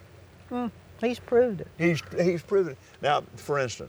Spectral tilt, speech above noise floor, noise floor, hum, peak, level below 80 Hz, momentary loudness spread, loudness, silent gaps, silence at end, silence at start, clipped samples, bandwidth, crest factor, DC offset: -6 dB/octave; 24 dB; -50 dBFS; none; -10 dBFS; -62 dBFS; 9 LU; -28 LUFS; none; 0 s; 0.15 s; under 0.1%; over 20 kHz; 18 dB; under 0.1%